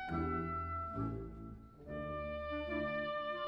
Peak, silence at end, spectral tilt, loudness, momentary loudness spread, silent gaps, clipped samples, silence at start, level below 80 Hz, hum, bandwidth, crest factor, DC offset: -28 dBFS; 0 s; -8.5 dB/octave; -41 LUFS; 11 LU; none; under 0.1%; 0 s; -52 dBFS; none; 6.6 kHz; 14 dB; under 0.1%